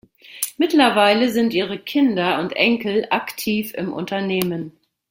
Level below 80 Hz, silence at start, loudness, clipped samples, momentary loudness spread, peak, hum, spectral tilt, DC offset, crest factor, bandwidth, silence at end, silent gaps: -62 dBFS; 0.25 s; -19 LUFS; under 0.1%; 11 LU; 0 dBFS; none; -4.5 dB/octave; under 0.1%; 20 dB; 16.5 kHz; 0.4 s; none